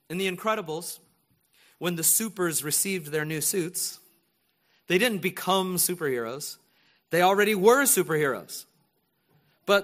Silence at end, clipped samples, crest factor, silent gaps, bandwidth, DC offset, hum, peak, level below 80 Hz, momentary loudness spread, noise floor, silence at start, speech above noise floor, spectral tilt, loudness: 0 s; under 0.1%; 22 dB; none; 15.5 kHz; under 0.1%; none; -6 dBFS; -72 dBFS; 15 LU; -71 dBFS; 0.1 s; 46 dB; -3 dB/octave; -25 LUFS